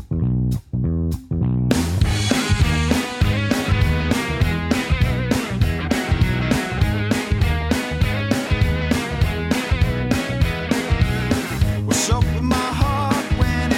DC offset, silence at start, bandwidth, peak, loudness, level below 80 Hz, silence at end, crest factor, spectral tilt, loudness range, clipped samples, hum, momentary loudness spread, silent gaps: under 0.1%; 0 s; 16.5 kHz; 0 dBFS; -20 LUFS; -26 dBFS; 0 s; 18 dB; -5.5 dB/octave; 1 LU; under 0.1%; none; 3 LU; none